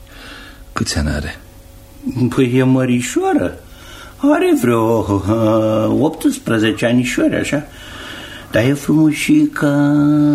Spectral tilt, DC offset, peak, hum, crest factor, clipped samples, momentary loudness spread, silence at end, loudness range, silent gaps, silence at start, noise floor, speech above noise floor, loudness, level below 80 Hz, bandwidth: -6 dB/octave; under 0.1%; -2 dBFS; none; 14 dB; under 0.1%; 18 LU; 0 s; 3 LU; none; 0 s; -39 dBFS; 25 dB; -15 LUFS; -36 dBFS; 15.5 kHz